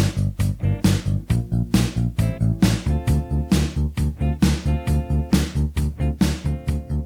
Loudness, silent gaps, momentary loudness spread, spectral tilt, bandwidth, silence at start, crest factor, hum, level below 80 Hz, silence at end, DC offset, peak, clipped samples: -22 LUFS; none; 4 LU; -6.5 dB/octave; 18.5 kHz; 0 s; 16 dB; none; -28 dBFS; 0 s; under 0.1%; -4 dBFS; under 0.1%